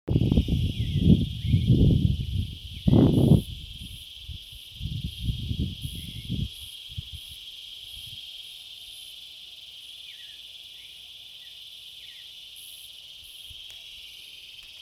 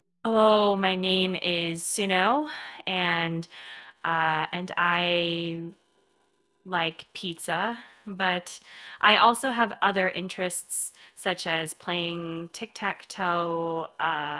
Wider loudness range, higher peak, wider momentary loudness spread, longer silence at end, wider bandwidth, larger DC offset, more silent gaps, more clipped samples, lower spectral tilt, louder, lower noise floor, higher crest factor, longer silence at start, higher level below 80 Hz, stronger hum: first, 18 LU vs 6 LU; about the same, -4 dBFS vs -4 dBFS; first, 20 LU vs 14 LU; about the same, 0.05 s vs 0 s; first, 15.5 kHz vs 12 kHz; neither; neither; neither; first, -7 dB/octave vs -3.5 dB/octave; about the same, -26 LUFS vs -26 LUFS; second, -45 dBFS vs -70 dBFS; about the same, 22 dB vs 22 dB; second, 0.05 s vs 0.25 s; first, -36 dBFS vs -70 dBFS; neither